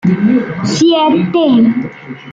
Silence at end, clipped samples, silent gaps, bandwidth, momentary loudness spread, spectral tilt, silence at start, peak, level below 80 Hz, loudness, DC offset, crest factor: 0 s; under 0.1%; none; 9 kHz; 11 LU; -6 dB/octave; 0.05 s; -2 dBFS; -50 dBFS; -11 LUFS; under 0.1%; 10 dB